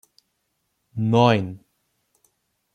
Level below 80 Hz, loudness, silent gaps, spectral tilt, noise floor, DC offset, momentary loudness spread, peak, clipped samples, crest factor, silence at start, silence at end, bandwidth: -64 dBFS; -20 LUFS; none; -7.5 dB/octave; -74 dBFS; under 0.1%; 20 LU; -4 dBFS; under 0.1%; 22 dB; 0.95 s; 1.15 s; 9.4 kHz